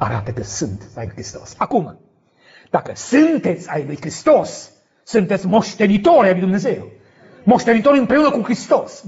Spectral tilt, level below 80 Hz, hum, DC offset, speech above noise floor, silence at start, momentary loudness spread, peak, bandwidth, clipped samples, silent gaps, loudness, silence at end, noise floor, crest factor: -5.5 dB/octave; -50 dBFS; none; under 0.1%; 36 dB; 0 s; 16 LU; -2 dBFS; 8 kHz; under 0.1%; none; -17 LUFS; 0 s; -52 dBFS; 16 dB